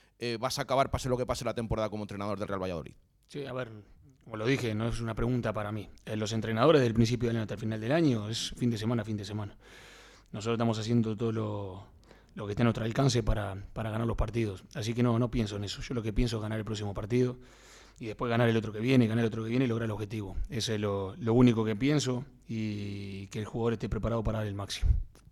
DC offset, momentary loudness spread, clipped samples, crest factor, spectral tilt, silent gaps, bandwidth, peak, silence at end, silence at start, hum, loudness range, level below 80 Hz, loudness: under 0.1%; 12 LU; under 0.1%; 20 dB; -6.5 dB/octave; none; 13.5 kHz; -12 dBFS; 0.25 s; 0.2 s; none; 5 LU; -44 dBFS; -31 LUFS